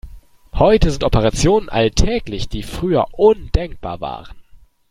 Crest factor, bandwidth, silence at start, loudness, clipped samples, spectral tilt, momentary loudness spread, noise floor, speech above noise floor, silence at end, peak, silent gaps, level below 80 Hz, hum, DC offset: 16 dB; 15 kHz; 0.05 s; -17 LUFS; under 0.1%; -5.5 dB/octave; 13 LU; -39 dBFS; 23 dB; 0.35 s; 0 dBFS; none; -26 dBFS; none; under 0.1%